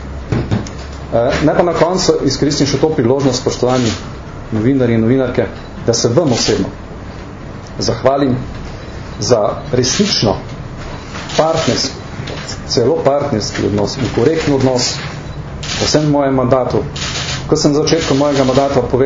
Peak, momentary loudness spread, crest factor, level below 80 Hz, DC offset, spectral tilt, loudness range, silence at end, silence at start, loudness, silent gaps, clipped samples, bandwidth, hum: 0 dBFS; 15 LU; 14 dB; -32 dBFS; under 0.1%; -5 dB/octave; 3 LU; 0 s; 0 s; -14 LUFS; none; under 0.1%; 7.8 kHz; none